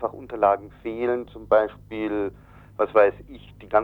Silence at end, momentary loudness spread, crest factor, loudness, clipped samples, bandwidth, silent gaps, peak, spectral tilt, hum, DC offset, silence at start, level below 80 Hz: 0 s; 14 LU; 18 dB; -24 LUFS; under 0.1%; 4.5 kHz; none; -6 dBFS; -8 dB/octave; 50 Hz at -55 dBFS; under 0.1%; 0 s; -52 dBFS